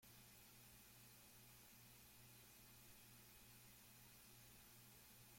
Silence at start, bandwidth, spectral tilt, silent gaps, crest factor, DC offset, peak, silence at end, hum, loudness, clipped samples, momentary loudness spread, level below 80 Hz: 0 s; 16.5 kHz; -2.5 dB/octave; none; 14 dB; under 0.1%; -52 dBFS; 0 s; 60 Hz at -80 dBFS; -64 LUFS; under 0.1%; 0 LU; -80 dBFS